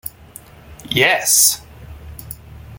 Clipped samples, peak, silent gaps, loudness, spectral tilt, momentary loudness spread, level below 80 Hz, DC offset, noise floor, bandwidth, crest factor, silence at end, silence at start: under 0.1%; 0 dBFS; none; -13 LUFS; -1 dB/octave; 24 LU; -44 dBFS; under 0.1%; -41 dBFS; 17 kHz; 20 dB; 0 s; 0.05 s